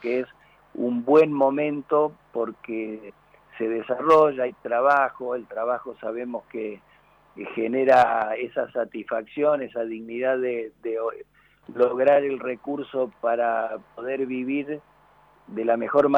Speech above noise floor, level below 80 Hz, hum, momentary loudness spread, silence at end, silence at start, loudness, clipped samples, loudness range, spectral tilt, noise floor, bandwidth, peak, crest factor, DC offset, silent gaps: 33 dB; -68 dBFS; none; 15 LU; 0 s; 0 s; -24 LUFS; under 0.1%; 4 LU; -7 dB/octave; -57 dBFS; 7.8 kHz; -8 dBFS; 18 dB; under 0.1%; none